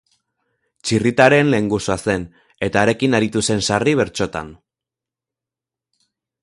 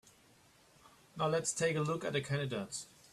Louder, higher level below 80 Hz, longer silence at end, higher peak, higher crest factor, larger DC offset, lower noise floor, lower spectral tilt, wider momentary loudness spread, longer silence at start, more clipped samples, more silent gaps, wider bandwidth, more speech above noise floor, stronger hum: first, -17 LUFS vs -36 LUFS; first, -48 dBFS vs -72 dBFS; first, 1.9 s vs 0.25 s; first, 0 dBFS vs -20 dBFS; about the same, 20 dB vs 18 dB; neither; first, -87 dBFS vs -65 dBFS; about the same, -5 dB/octave vs -4.5 dB/octave; first, 14 LU vs 10 LU; second, 0.85 s vs 1.15 s; neither; neither; second, 11.5 kHz vs 14 kHz; first, 70 dB vs 30 dB; neither